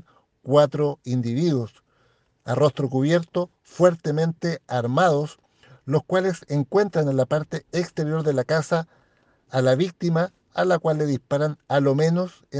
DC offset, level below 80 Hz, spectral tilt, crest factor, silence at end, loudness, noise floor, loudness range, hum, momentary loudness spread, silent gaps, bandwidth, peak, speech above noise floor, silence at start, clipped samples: under 0.1%; -64 dBFS; -7 dB/octave; 18 dB; 0 s; -23 LUFS; -64 dBFS; 2 LU; none; 9 LU; none; 9.4 kHz; -4 dBFS; 42 dB; 0.45 s; under 0.1%